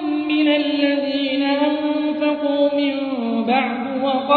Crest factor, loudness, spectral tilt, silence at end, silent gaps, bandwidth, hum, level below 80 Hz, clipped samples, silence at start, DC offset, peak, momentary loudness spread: 16 dB; -19 LUFS; -7.5 dB/octave; 0 s; none; 4.7 kHz; none; -64 dBFS; under 0.1%; 0 s; under 0.1%; -4 dBFS; 4 LU